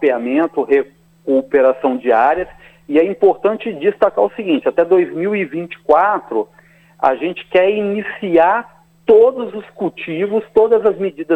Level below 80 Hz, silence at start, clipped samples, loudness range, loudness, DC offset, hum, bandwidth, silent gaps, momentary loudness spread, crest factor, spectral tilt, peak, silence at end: -54 dBFS; 0 s; under 0.1%; 2 LU; -16 LUFS; under 0.1%; none; 4.2 kHz; none; 10 LU; 16 dB; -7.5 dB/octave; 0 dBFS; 0 s